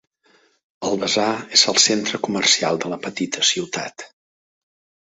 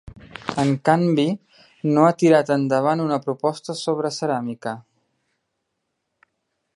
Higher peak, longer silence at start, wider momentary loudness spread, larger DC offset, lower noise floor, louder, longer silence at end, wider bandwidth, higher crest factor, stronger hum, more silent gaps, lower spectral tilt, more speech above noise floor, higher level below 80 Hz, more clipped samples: about the same, 0 dBFS vs -2 dBFS; first, 0.8 s vs 0.05 s; about the same, 14 LU vs 15 LU; neither; second, -59 dBFS vs -77 dBFS; first, -18 LUFS vs -21 LUFS; second, 1 s vs 1.95 s; second, 8.4 kHz vs 11.5 kHz; about the same, 22 dB vs 20 dB; neither; neither; second, -1.5 dB/octave vs -6.5 dB/octave; second, 39 dB vs 57 dB; about the same, -64 dBFS vs -60 dBFS; neither